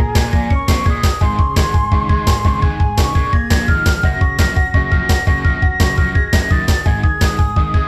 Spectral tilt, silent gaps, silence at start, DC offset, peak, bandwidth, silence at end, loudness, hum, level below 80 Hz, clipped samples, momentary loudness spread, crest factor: -5.5 dB/octave; none; 0 s; 0.4%; 0 dBFS; 13.5 kHz; 0 s; -15 LUFS; none; -18 dBFS; under 0.1%; 1 LU; 14 dB